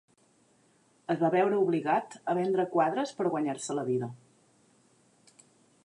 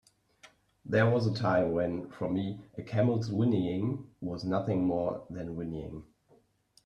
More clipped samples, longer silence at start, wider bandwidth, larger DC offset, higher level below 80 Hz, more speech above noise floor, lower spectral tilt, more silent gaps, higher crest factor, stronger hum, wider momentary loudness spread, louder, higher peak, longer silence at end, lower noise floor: neither; first, 1.1 s vs 0.45 s; first, 11 kHz vs 8.8 kHz; neither; second, -84 dBFS vs -62 dBFS; about the same, 38 dB vs 36 dB; second, -6 dB/octave vs -8.5 dB/octave; neither; about the same, 16 dB vs 18 dB; neither; second, 8 LU vs 12 LU; about the same, -29 LUFS vs -31 LUFS; about the same, -14 dBFS vs -14 dBFS; first, 1.7 s vs 0.85 s; about the same, -66 dBFS vs -67 dBFS